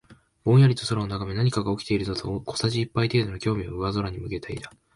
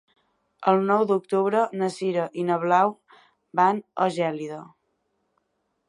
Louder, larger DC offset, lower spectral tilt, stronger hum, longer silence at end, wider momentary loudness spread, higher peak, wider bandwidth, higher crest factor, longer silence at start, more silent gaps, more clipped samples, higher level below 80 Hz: about the same, -25 LUFS vs -24 LUFS; neither; about the same, -6.5 dB/octave vs -6.5 dB/octave; neither; second, 0.25 s vs 1.25 s; first, 13 LU vs 7 LU; about the same, -8 dBFS vs -6 dBFS; about the same, 11.5 kHz vs 11.5 kHz; about the same, 16 dB vs 20 dB; second, 0.1 s vs 0.6 s; neither; neither; first, -46 dBFS vs -78 dBFS